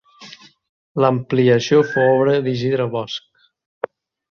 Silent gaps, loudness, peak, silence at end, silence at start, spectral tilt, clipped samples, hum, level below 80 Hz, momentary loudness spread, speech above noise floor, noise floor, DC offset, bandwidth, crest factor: 0.69-0.95 s; -17 LUFS; -2 dBFS; 1.15 s; 0.2 s; -6.5 dB/octave; under 0.1%; none; -60 dBFS; 16 LU; 26 dB; -43 dBFS; under 0.1%; 7 kHz; 18 dB